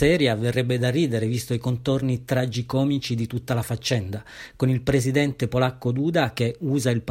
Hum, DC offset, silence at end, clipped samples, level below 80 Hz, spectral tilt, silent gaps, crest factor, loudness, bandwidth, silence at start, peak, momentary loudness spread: none; under 0.1%; 0 s; under 0.1%; -48 dBFS; -6 dB/octave; none; 16 dB; -24 LUFS; 16 kHz; 0 s; -6 dBFS; 5 LU